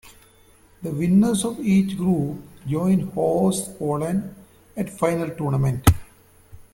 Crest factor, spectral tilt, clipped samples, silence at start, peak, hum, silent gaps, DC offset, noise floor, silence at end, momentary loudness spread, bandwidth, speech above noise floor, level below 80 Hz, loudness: 22 dB; -6.5 dB/octave; under 0.1%; 0.05 s; 0 dBFS; none; none; under 0.1%; -53 dBFS; 0.15 s; 12 LU; 16.5 kHz; 33 dB; -40 dBFS; -22 LUFS